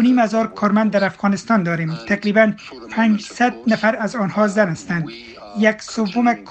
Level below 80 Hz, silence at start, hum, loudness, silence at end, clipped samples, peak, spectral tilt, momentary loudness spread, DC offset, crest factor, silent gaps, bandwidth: -58 dBFS; 0 s; none; -18 LUFS; 0 s; under 0.1%; 0 dBFS; -6 dB/octave; 8 LU; under 0.1%; 18 dB; none; 8.6 kHz